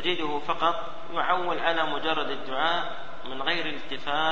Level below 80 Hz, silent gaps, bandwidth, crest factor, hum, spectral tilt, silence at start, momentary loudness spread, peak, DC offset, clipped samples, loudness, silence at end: -58 dBFS; none; 7.8 kHz; 20 dB; none; -4.5 dB/octave; 0 s; 8 LU; -8 dBFS; 3%; under 0.1%; -28 LUFS; 0 s